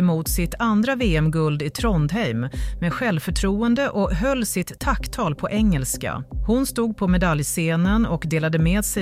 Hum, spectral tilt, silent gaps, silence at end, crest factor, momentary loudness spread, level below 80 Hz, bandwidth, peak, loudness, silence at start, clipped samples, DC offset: none; -5.5 dB/octave; none; 0 s; 14 dB; 5 LU; -30 dBFS; 16 kHz; -6 dBFS; -22 LUFS; 0 s; under 0.1%; under 0.1%